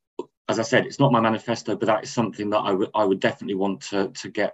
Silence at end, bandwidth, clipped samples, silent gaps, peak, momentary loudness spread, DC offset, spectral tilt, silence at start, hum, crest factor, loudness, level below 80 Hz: 0 s; 8.6 kHz; under 0.1%; 0.37-0.45 s; -4 dBFS; 8 LU; under 0.1%; -5.5 dB/octave; 0.2 s; none; 18 dB; -23 LUFS; -68 dBFS